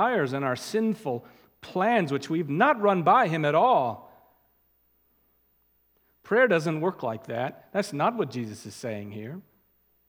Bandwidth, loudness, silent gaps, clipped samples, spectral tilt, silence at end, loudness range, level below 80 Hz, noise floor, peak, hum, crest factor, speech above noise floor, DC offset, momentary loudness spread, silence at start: 19 kHz; -26 LUFS; none; under 0.1%; -6 dB/octave; 0.65 s; 6 LU; -74 dBFS; -68 dBFS; -6 dBFS; none; 22 dB; 42 dB; under 0.1%; 15 LU; 0 s